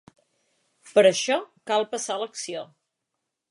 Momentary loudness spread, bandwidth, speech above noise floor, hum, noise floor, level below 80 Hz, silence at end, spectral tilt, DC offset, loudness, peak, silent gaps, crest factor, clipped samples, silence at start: 15 LU; 11.5 kHz; 59 dB; none; -82 dBFS; -82 dBFS; 0.85 s; -2.5 dB/octave; under 0.1%; -24 LUFS; -6 dBFS; none; 22 dB; under 0.1%; 0.85 s